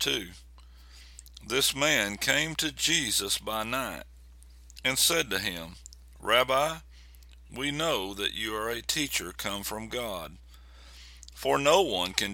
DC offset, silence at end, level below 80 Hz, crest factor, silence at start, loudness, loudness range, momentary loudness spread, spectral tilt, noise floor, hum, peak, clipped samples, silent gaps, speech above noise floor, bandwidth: under 0.1%; 0 s; -52 dBFS; 28 dB; 0 s; -27 LUFS; 5 LU; 20 LU; -2 dB/octave; -51 dBFS; none; -2 dBFS; under 0.1%; none; 22 dB; 17.5 kHz